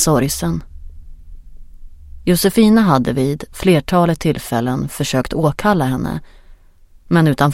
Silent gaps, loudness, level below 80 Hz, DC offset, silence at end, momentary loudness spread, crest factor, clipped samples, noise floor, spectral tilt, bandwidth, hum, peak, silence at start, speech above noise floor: none; -16 LUFS; -36 dBFS; under 0.1%; 0 s; 10 LU; 16 dB; under 0.1%; -46 dBFS; -5.5 dB/octave; 16.5 kHz; none; 0 dBFS; 0 s; 31 dB